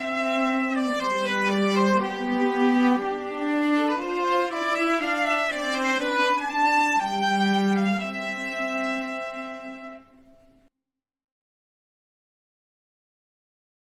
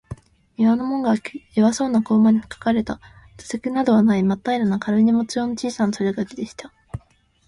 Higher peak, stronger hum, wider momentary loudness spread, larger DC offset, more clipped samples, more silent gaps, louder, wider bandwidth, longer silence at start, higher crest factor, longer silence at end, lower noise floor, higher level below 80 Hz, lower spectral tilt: second, -10 dBFS vs -6 dBFS; neither; second, 8 LU vs 21 LU; neither; neither; neither; second, -24 LUFS vs -20 LUFS; first, 15 kHz vs 11 kHz; about the same, 0 s vs 0.1 s; about the same, 16 dB vs 14 dB; first, 3.95 s vs 0.5 s; first, -87 dBFS vs -55 dBFS; second, -64 dBFS vs -52 dBFS; second, -5 dB/octave vs -6.5 dB/octave